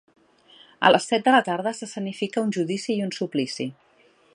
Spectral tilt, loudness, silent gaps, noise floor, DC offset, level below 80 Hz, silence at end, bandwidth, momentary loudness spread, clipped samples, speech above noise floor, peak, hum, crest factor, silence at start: -4.5 dB/octave; -23 LUFS; none; -59 dBFS; under 0.1%; -74 dBFS; 0.6 s; 11.5 kHz; 12 LU; under 0.1%; 36 dB; 0 dBFS; none; 24 dB; 0.8 s